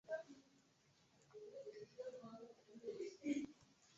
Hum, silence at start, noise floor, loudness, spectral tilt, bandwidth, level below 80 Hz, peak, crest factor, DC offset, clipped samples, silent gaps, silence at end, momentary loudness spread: none; 0.05 s; -76 dBFS; -51 LUFS; -4.5 dB/octave; 7.6 kHz; -88 dBFS; -30 dBFS; 22 dB; under 0.1%; under 0.1%; none; 0 s; 18 LU